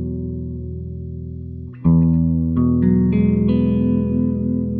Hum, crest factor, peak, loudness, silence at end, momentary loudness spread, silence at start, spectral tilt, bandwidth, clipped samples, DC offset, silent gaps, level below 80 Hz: none; 14 dB; -4 dBFS; -18 LUFS; 0 s; 14 LU; 0 s; -11.5 dB/octave; 4.2 kHz; under 0.1%; under 0.1%; none; -32 dBFS